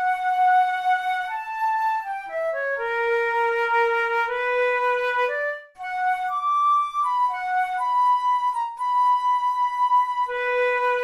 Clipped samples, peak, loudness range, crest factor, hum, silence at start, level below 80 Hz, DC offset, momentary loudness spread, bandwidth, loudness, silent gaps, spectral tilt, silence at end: under 0.1%; -10 dBFS; 2 LU; 12 dB; none; 0 s; -64 dBFS; under 0.1%; 7 LU; 13 kHz; -22 LUFS; none; -0.5 dB/octave; 0 s